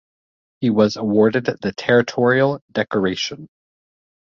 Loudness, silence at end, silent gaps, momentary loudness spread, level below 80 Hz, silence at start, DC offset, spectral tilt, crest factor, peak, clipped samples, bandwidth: -19 LUFS; 0.9 s; 2.61-2.68 s; 8 LU; -58 dBFS; 0.6 s; under 0.1%; -6 dB/octave; 18 dB; -2 dBFS; under 0.1%; 7.4 kHz